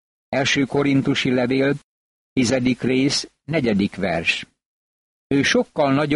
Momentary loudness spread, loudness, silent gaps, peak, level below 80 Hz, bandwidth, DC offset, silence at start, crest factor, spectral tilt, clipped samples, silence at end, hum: 5 LU; -20 LUFS; 1.84-2.36 s, 4.66-5.30 s; -4 dBFS; -52 dBFS; 11.5 kHz; under 0.1%; 0.3 s; 16 dB; -5 dB/octave; under 0.1%; 0 s; none